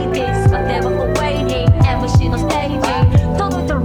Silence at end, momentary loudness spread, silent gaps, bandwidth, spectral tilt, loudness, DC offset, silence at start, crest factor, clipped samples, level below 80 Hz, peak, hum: 0 s; 4 LU; none; 13.5 kHz; -7 dB/octave; -16 LUFS; under 0.1%; 0 s; 14 dB; under 0.1%; -24 dBFS; 0 dBFS; none